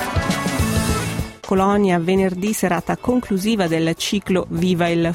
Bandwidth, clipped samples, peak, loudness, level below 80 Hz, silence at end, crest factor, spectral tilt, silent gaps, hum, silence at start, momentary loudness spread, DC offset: 16.5 kHz; under 0.1%; -4 dBFS; -19 LUFS; -36 dBFS; 0 s; 14 dB; -5.5 dB/octave; none; none; 0 s; 4 LU; under 0.1%